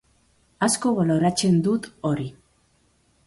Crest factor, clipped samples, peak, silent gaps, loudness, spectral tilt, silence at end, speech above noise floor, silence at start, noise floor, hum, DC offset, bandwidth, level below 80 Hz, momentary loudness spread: 16 dB; under 0.1%; -8 dBFS; none; -22 LUFS; -5 dB/octave; 0.95 s; 42 dB; 0.6 s; -63 dBFS; none; under 0.1%; 11.5 kHz; -58 dBFS; 7 LU